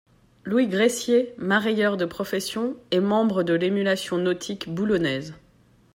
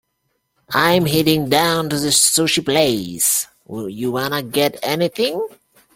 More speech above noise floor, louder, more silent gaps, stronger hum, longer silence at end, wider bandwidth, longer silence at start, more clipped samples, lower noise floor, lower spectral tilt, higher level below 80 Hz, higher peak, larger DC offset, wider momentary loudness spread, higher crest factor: second, 35 dB vs 53 dB; second, -24 LUFS vs -17 LUFS; neither; neither; about the same, 0.55 s vs 0.5 s; about the same, 16 kHz vs 16.5 kHz; second, 0.45 s vs 0.7 s; neither; second, -58 dBFS vs -70 dBFS; first, -5 dB/octave vs -3 dB/octave; second, -60 dBFS vs -52 dBFS; second, -8 dBFS vs -2 dBFS; neither; second, 8 LU vs 11 LU; about the same, 16 dB vs 18 dB